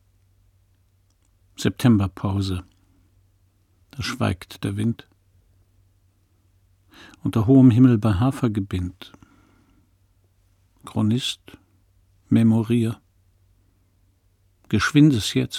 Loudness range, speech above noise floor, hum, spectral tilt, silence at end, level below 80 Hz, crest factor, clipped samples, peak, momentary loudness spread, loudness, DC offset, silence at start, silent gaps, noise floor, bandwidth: 10 LU; 43 dB; none; -6.5 dB/octave; 0 s; -50 dBFS; 20 dB; under 0.1%; -4 dBFS; 16 LU; -21 LUFS; under 0.1%; 1.6 s; none; -62 dBFS; 15 kHz